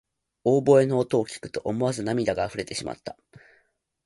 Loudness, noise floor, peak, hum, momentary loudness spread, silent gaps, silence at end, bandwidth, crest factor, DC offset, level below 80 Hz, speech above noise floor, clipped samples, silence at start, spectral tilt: -24 LUFS; -68 dBFS; -6 dBFS; none; 14 LU; none; 0.95 s; 11.5 kHz; 20 dB; under 0.1%; -58 dBFS; 44 dB; under 0.1%; 0.45 s; -6 dB/octave